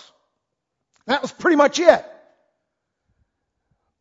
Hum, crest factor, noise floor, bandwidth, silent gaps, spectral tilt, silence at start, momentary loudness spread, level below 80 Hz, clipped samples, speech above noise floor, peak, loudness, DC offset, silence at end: none; 22 dB; -79 dBFS; 7.8 kHz; none; -3 dB/octave; 1.1 s; 9 LU; -64 dBFS; under 0.1%; 62 dB; 0 dBFS; -18 LUFS; under 0.1%; 2 s